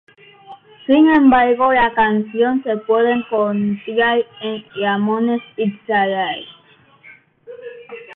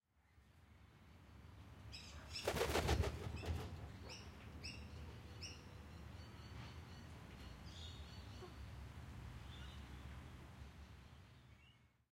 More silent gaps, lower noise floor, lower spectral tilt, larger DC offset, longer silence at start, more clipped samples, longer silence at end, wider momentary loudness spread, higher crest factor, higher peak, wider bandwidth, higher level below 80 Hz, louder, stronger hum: neither; second, -50 dBFS vs -72 dBFS; first, -9 dB/octave vs -4.5 dB/octave; neither; first, 0.5 s vs 0.15 s; neither; second, 0 s vs 0.25 s; second, 16 LU vs 22 LU; second, 14 dB vs 24 dB; first, -2 dBFS vs -26 dBFS; second, 4.2 kHz vs 16 kHz; about the same, -52 dBFS vs -56 dBFS; first, -16 LUFS vs -49 LUFS; neither